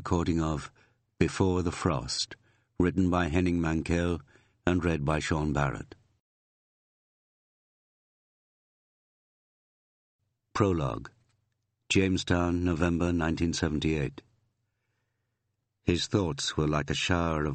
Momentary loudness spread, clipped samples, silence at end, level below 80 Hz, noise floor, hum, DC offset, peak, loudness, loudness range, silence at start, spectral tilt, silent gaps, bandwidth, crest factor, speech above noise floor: 8 LU; under 0.1%; 0 s; -46 dBFS; -81 dBFS; none; under 0.1%; -8 dBFS; -29 LUFS; 7 LU; 0 s; -5.5 dB/octave; 6.20-10.19 s; 8.8 kHz; 22 dB; 53 dB